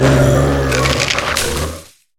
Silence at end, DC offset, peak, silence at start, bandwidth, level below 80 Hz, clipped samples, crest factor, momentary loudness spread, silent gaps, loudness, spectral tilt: 0.35 s; under 0.1%; 0 dBFS; 0 s; 17.5 kHz; -26 dBFS; under 0.1%; 14 dB; 11 LU; none; -14 LUFS; -4.5 dB/octave